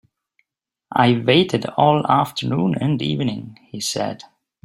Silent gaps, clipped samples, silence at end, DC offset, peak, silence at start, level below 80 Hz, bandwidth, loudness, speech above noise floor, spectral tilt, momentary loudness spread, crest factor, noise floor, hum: none; under 0.1%; 0.45 s; under 0.1%; -2 dBFS; 0.9 s; -56 dBFS; 16 kHz; -19 LUFS; 62 dB; -5.5 dB/octave; 11 LU; 18 dB; -81 dBFS; none